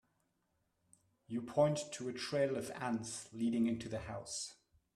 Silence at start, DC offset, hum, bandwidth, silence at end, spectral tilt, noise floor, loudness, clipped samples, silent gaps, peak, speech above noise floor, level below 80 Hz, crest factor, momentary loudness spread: 1.3 s; under 0.1%; none; 13.5 kHz; 0.4 s; -5 dB/octave; -81 dBFS; -38 LUFS; under 0.1%; none; -18 dBFS; 44 dB; -70 dBFS; 20 dB; 11 LU